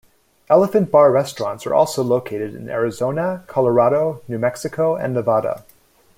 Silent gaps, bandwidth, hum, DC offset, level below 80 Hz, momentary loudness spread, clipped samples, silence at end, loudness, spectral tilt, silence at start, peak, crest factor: none; 16.5 kHz; none; under 0.1%; -60 dBFS; 11 LU; under 0.1%; 0.55 s; -18 LUFS; -6.5 dB/octave; 0.5 s; -2 dBFS; 16 dB